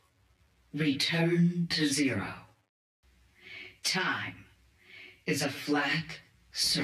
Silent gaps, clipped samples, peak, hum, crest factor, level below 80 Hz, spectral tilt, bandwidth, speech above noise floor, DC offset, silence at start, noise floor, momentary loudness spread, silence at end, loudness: 2.69-3.03 s; under 0.1%; -18 dBFS; none; 14 dB; -66 dBFS; -4 dB/octave; 14.5 kHz; 37 dB; under 0.1%; 0.75 s; -67 dBFS; 19 LU; 0 s; -30 LUFS